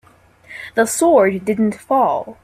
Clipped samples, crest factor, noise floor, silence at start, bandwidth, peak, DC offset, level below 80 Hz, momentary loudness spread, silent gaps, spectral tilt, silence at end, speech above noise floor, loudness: under 0.1%; 16 dB; -46 dBFS; 0.5 s; 16 kHz; -2 dBFS; under 0.1%; -56 dBFS; 12 LU; none; -5 dB/octave; 0.1 s; 30 dB; -16 LUFS